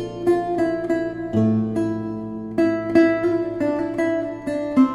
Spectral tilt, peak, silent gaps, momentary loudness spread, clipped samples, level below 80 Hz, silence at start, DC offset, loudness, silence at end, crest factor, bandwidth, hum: -8 dB/octave; -4 dBFS; none; 9 LU; under 0.1%; -54 dBFS; 0 s; under 0.1%; -22 LUFS; 0 s; 18 dB; 10.5 kHz; none